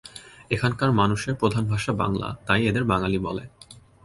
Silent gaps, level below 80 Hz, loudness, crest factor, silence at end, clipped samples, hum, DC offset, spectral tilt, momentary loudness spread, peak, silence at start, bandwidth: none; -46 dBFS; -24 LUFS; 20 dB; 0.25 s; under 0.1%; none; under 0.1%; -6 dB/octave; 12 LU; -4 dBFS; 0.05 s; 11.5 kHz